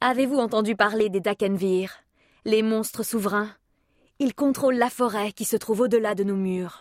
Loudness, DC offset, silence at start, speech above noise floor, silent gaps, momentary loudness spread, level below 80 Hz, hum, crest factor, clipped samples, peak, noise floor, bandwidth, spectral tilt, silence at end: -24 LUFS; under 0.1%; 0 s; 42 dB; none; 6 LU; -66 dBFS; none; 20 dB; under 0.1%; -6 dBFS; -65 dBFS; 16 kHz; -5 dB/octave; 0.05 s